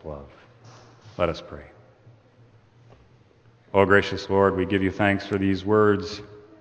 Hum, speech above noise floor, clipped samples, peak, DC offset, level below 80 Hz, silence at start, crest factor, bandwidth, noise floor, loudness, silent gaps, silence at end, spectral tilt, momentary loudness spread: none; 34 dB; under 0.1%; -4 dBFS; under 0.1%; -54 dBFS; 0.05 s; 22 dB; 8.6 kHz; -56 dBFS; -22 LUFS; none; 0.2 s; -7 dB/octave; 21 LU